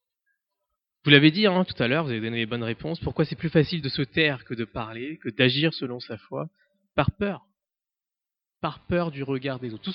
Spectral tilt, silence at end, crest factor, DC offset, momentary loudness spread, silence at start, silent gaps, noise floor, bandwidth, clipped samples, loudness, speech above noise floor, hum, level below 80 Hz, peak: -10 dB/octave; 0 s; 26 dB; under 0.1%; 15 LU; 1.05 s; none; under -90 dBFS; 5.8 kHz; under 0.1%; -25 LUFS; over 65 dB; none; -52 dBFS; -2 dBFS